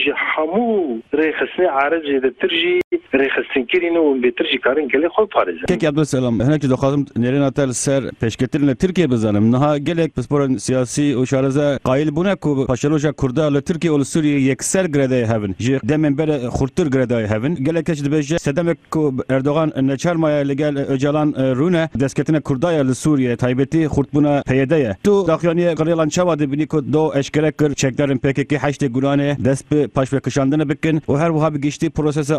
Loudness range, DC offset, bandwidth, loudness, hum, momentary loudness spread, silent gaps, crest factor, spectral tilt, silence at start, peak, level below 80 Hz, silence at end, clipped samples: 2 LU; under 0.1%; 14 kHz; -18 LUFS; none; 3 LU; 2.84-2.91 s; 16 dB; -6 dB/octave; 0 s; -2 dBFS; -44 dBFS; 0 s; under 0.1%